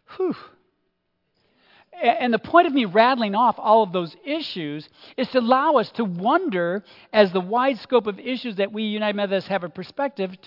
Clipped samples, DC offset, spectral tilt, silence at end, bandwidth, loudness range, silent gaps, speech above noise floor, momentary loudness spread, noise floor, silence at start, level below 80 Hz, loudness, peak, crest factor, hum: under 0.1%; under 0.1%; -8 dB/octave; 0.1 s; 5.8 kHz; 3 LU; none; 51 dB; 11 LU; -73 dBFS; 0.1 s; -70 dBFS; -22 LUFS; -2 dBFS; 20 dB; none